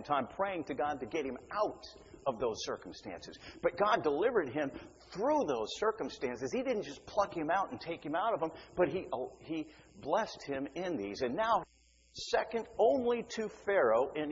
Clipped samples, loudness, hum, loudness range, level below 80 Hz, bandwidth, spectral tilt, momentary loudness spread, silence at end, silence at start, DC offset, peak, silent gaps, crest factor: under 0.1%; -35 LUFS; none; 3 LU; -64 dBFS; 7.6 kHz; -3 dB/octave; 13 LU; 0 s; 0 s; under 0.1%; -16 dBFS; none; 20 dB